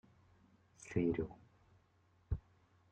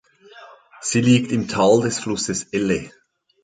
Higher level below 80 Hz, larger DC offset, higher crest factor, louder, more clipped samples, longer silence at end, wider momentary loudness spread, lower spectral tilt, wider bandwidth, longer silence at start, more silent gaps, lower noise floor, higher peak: about the same, -56 dBFS vs -52 dBFS; neither; about the same, 22 dB vs 18 dB; second, -41 LUFS vs -20 LUFS; neither; about the same, 0.55 s vs 0.55 s; first, 19 LU vs 9 LU; first, -8 dB/octave vs -5 dB/octave; about the same, 9 kHz vs 9.4 kHz; first, 0.8 s vs 0.35 s; neither; first, -73 dBFS vs -45 dBFS; second, -24 dBFS vs -4 dBFS